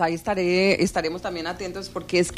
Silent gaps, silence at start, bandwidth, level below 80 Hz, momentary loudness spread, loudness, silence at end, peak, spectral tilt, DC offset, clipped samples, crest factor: none; 0 s; 14.5 kHz; -48 dBFS; 12 LU; -24 LUFS; 0 s; -8 dBFS; -4.5 dB/octave; under 0.1%; under 0.1%; 16 dB